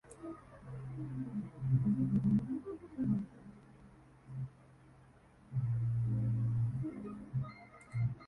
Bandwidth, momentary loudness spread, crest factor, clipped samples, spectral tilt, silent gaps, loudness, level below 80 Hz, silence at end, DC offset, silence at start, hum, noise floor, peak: 10.5 kHz; 17 LU; 16 dB; under 0.1%; -10.5 dB/octave; none; -37 LUFS; -60 dBFS; 0 s; under 0.1%; 0.05 s; none; -62 dBFS; -22 dBFS